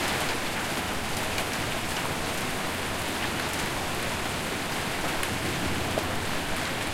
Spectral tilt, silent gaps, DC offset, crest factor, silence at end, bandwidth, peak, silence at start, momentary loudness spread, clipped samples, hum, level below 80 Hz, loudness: -3 dB/octave; none; under 0.1%; 18 dB; 0 s; 16.5 kHz; -12 dBFS; 0 s; 1 LU; under 0.1%; none; -44 dBFS; -29 LUFS